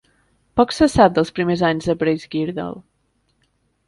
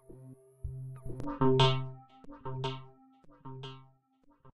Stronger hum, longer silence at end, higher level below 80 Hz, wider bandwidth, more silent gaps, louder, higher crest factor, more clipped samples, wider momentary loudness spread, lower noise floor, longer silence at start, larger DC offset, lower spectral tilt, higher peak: neither; first, 1.05 s vs 0.05 s; first, -44 dBFS vs -54 dBFS; first, 11.5 kHz vs 8.8 kHz; neither; first, -18 LUFS vs -32 LUFS; about the same, 20 dB vs 24 dB; neither; second, 13 LU vs 27 LU; about the same, -66 dBFS vs -67 dBFS; first, 0.55 s vs 0.1 s; neither; about the same, -6 dB/octave vs -6.5 dB/octave; first, 0 dBFS vs -12 dBFS